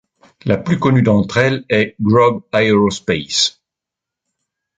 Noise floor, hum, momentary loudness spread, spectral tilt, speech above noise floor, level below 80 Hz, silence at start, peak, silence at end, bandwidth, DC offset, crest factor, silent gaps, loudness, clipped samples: -84 dBFS; none; 6 LU; -5 dB/octave; 69 dB; -46 dBFS; 0.45 s; -2 dBFS; 1.3 s; 9.4 kHz; under 0.1%; 16 dB; none; -15 LUFS; under 0.1%